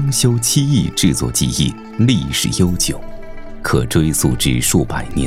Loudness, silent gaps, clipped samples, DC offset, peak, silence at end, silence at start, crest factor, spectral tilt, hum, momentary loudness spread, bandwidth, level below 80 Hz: -16 LUFS; none; under 0.1%; under 0.1%; -2 dBFS; 0 s; 0 s; 14 dB; -4.5 dB/octave; none; 8 LU; 16.5 kHz; -30 dBFS